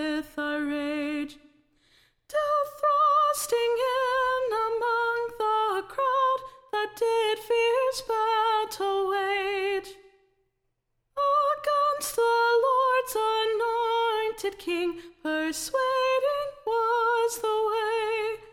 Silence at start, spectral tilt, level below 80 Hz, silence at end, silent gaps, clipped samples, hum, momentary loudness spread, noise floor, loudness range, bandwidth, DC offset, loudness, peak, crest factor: 0 s; -1.5 dB/octave; -62 dBFS; 0 s; none; under 0.1%; none; 8 LU; -77 dBFS; 3 LU; 17 kHz; under 0.1%; -26 LUFS; -14 dBFS; 12 dB